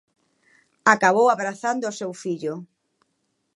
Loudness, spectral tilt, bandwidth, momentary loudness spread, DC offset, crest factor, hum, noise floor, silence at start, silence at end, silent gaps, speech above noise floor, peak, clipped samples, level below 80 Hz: -22 LUFS; -4 dB/octave; 11.5 kHz; 14 LU; under 0.1%; 22 dB; none; -73 dBFS; 0.85 s; 0.9 s; none; 52 dB; -2 dBFS; under 0.1%; -76 dBFS